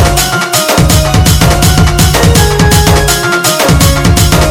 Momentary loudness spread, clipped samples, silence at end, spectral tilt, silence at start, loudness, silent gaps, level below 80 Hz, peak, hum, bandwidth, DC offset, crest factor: 2 LU; 3%; 0 s; -4 dB/octave; 0 s; -7 LUFS; none; -14 dBFS; 0 dBFS; none; over 20 kHz; under 0.1%; 6 dB